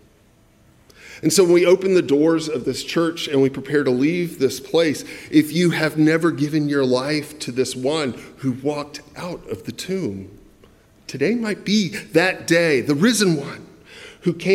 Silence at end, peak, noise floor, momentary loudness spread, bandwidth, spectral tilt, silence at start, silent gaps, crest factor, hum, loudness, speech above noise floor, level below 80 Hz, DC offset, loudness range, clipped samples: 0 s; -2 dBFS; -54 dBFS; 14 LU; 16 kHz; -5 dB/octave; 1.05 s; none; 18 dB; none; -20 LUFS; 35 dB; -58 dBFS; under 0.1%; 8 LU; under 0.1%